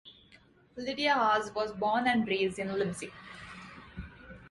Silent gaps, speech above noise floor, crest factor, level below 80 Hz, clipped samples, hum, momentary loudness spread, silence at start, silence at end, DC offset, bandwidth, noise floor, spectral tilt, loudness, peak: none; 30 dB; 18 dB; -58 dBFS; under 0.1%; none; 20 LU; 0.05 s; 0 s; under 0.1%; 11.5 kHz; -61 dBFS; -4.5 dB/octave; -30 LUFS; -16 dBFS